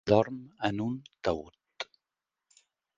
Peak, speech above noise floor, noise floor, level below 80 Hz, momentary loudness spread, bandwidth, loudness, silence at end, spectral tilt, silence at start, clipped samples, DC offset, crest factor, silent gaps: -8 dBFS; 60 dB; -89 dBFS; -58 dBFS; 16 LU; 7.6 kHz; -33 LUFS; 1.15 s; -6.5 dB/octave; 0.05 s; under 0.1%; under 0.1%; 24 dB; none